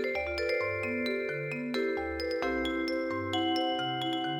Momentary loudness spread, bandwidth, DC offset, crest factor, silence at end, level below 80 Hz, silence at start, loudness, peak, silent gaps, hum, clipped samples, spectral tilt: 3 LU; 17.5 kHz; under 0.1%; 14 dB; 0 s; -54 dBFS; 0 s; -31 LUFS; -18 dBFS; none; none; under 0.1%; -5 dB/octave